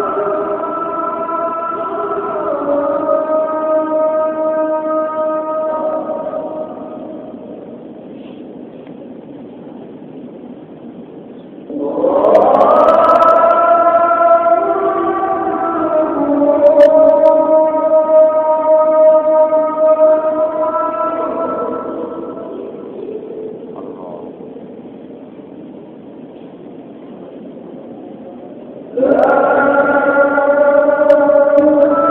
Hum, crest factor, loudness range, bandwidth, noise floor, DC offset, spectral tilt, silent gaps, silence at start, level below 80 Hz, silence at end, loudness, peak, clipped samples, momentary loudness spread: none; 14 dB; 22 LU; 4.4 kHz; -33 dBFS; under 0.1%; -8 dB/octave; none; 0 s; -56 dBFS; 0 s; -12 LUFS; 0 dBFS; under 0.1%; 24 LU